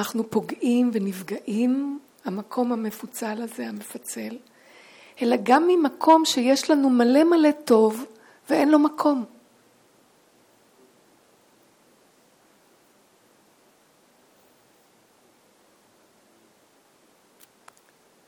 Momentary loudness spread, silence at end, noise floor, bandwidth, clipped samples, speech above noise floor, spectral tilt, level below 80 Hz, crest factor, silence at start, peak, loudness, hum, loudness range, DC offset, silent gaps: 16 LU; 9 s; -60 dBFS; 18.5 kHz; under 0.1%; 38 dB; -4.5 dB/octave; -78 dBFS; 22 dB; 0 s; -4 dBFS; -22 LUFS; none; 11 LU; under 0.1%; none